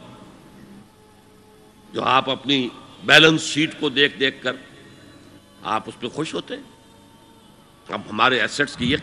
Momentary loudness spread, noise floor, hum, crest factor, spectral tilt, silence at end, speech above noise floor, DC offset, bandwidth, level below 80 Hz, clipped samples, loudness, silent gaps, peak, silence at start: 19 LU; -50 dBFS; none; 24 dB; -3.5 dB/octave; 0 s; 30 dB; under 0.1%; 15.5 kHz; -56 dBFS; under 0.1%; -19 LUFS; none; 0 dBFS; 0 s